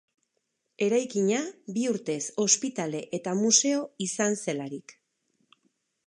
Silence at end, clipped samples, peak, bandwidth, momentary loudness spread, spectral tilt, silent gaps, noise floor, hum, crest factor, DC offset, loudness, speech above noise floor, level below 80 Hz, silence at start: 1.15 s; under 0.1%; -8 dBFS; 11.5 kHz; 12 LU; -3 dB/octave; none; -79 dBFS; none; 22 dB; under 0.1%; -27 LUFS; 51 dB; -82 dBFS; 0.8 s